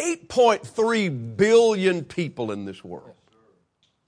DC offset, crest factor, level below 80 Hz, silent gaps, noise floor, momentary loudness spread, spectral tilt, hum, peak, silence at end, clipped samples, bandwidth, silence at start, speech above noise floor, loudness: under 0.1%; 18 dB; -62 dBFS; none; -68 dBFS; 19 LU; -5 dB/octave; none; -6 dBFS; 0.95 s; under 0.1%; 10.5 kHz; 0 s; 46 dB; -21 LUFS